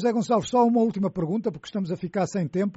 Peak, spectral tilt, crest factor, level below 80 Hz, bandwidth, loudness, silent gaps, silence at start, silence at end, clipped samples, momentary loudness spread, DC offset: -10 dBFS; -7 dB/octave; 14 dB; -60 dBFS; 8 kHz; -25 LUFS; none; 0 s; 0.05 s; under 0.1%; 9 LU; under 0.1%